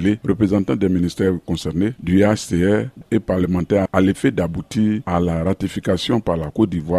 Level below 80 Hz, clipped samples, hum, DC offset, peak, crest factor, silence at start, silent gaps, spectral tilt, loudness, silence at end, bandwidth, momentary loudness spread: -40 dBFS; under 0.1%; none; under 0.1%; -2 dBFS; 18 dB; 0 s; none; -7 dB/octave; -19 LUFS; 0 s; 13.5 kHz; 6 LU